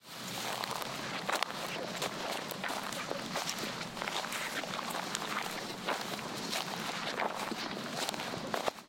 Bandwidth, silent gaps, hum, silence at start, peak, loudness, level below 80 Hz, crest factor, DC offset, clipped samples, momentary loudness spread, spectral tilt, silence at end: 17 kHz; none; none; 0.05 s; -8 dBFS; -37 LUFS; -72 dBFS; 30 dB; under 0.1%; under 0.1%; 3 LU; -2.5 dB/octave; 0 s